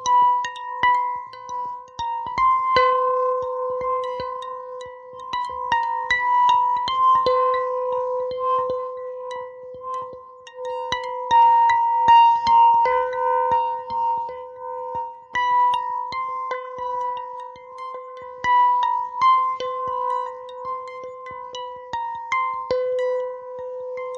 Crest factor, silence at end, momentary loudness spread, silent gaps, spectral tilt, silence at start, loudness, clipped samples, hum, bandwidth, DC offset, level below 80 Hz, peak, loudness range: 16 dB; 0 s; 17 LU; none; -2.5 dB/octave; 0 s; -21 LUFS; under 0.1%; none; 7.4 kHz; under 0.1%; -58 dBFS; -6 dBFS; 10 LU